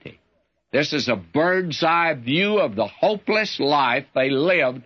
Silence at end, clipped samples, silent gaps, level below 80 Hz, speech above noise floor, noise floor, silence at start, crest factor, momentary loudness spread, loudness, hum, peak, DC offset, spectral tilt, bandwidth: 0.05 s; under 0.1%; none; -66 dBFS; 47 dB; -68 dBFS; 0.05 s; 14 dB; 4 LU; -20 LUFS; none; -6 dBFS; under 0.1%; -5 dB/octave; 7.2 kHz